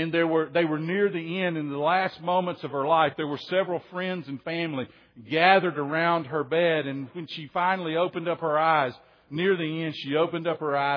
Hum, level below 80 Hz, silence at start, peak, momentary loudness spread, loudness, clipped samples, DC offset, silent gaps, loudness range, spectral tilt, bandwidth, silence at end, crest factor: none; -76 dBFS; 0 s; -4 dBFS; 10 LU; -26 LUFS; under 0.1%; under 0.1%; none; 2 LU; -8 dB/octave; 5.4 kHz; 0 s; 22 dB